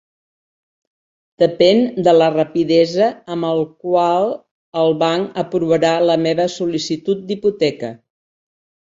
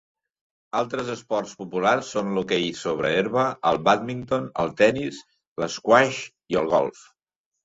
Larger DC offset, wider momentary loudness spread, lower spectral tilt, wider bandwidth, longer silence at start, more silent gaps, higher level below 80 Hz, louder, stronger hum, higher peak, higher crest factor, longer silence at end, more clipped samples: neither; second, 8 LU vs 11 LU; first, -6 dB/octave vs -4.5 dB/octave; about the same, 7.8 kHz vs 8 kHz; first, 1.4 s vs 0.75 s; first, 4.51-4.72 s vs 5.47-5.56 s; about the same, -60 dBFS vs -60 dBFS; first, -16 LUFS vs -24 LUFS; neither; about the same, -2 dBFS vs -2 dBFS; second, 16 dB vs 22 dB; first, 1.05 s vs 0.75 s; neither